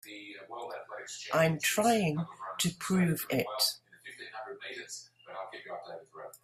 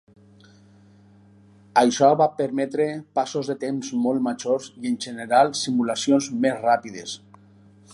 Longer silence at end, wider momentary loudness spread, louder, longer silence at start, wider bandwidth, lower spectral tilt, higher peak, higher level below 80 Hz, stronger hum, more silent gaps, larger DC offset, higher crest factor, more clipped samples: second, 0.05 s vs 0.75 s; first, 18 LU vs 11 LU; second, -31 LUFS vs -22 LUFS; second, 0.05 s vs 1.75 s; first, 16 kHz vs 11.5 kHz; about the same, -4 dB/octave vs -4.5 dB/octave; second, -14 dBFS vs -4 dBFS; about the same, -70 dBFS vs -70 dBFS; neither; neither; neither; about the same, 20 dB vs 20 dB; neither